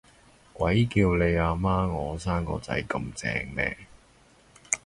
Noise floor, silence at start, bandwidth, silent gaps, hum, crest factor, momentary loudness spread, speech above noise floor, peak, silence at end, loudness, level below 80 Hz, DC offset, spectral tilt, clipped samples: -58 dBFS; 0.55 s; 11.5 kHz; none; none; 24 dB; 8 LU; 32 dB; -4 dBFS; 0.1 s; -27 LUFS; -40 dBFS; under 0.1%; -5.5 dB/octave; under 0.1%